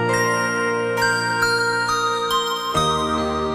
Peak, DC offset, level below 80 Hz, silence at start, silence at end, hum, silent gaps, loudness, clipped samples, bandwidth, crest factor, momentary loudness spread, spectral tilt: -6 dBFS; under 0.1%; -44 dBFS; 0 s; 0 s; none; none; -20 LUFS; under 0.1%; 15 kHz; 16 dB; 3 LU; -3.5 dB/octave